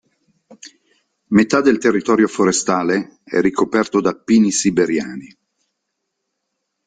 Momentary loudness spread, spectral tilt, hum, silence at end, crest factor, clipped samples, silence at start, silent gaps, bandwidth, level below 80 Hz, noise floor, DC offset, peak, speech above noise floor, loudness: 8 LU; -4.5 dB/octave; none; 1.6 s; 16 dB; under 0.1%; 0.5 s; none; 9.6 kHz; -56 dBFS; -76 dBFS; under 0.1%; -2 dBFS; 60 dB; -16 LUFS